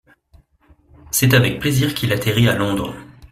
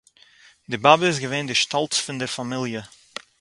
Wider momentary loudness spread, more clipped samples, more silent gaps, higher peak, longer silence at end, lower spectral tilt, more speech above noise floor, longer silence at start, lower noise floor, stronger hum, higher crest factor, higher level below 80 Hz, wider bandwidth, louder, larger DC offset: second, 10 LU vs 19 LU; neither; neither; about the same, -2 dBFS vs 0 dBFS; second, 0.05 s vs 0.55 s; first, -4.5 dB/octave vs -3 dB/octave; first, 37 dB vs 32 dB; first, 1.05 s vs 0.7 s; about the same, -54 dBFS vs -53 dBFS; neither; second, 18 dB vs 24 dB; first, -44 dBFS vs -64 dBFS; first, 16 kHz vs 11.5 kHz; first, -17 LUFS vs -21 LUFS; neither